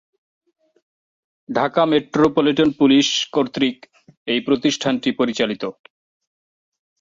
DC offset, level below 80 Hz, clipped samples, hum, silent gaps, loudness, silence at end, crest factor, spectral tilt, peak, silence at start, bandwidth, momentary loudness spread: under 0.1%; -58 dBFS; under 0.1%; none; 4.17-4.26 s; -18 LUFS; 1.3 s; 18 dB; -4.5 dB/octave; -4 dBFS; 1.5 s; 7.6 kHz; 8 LU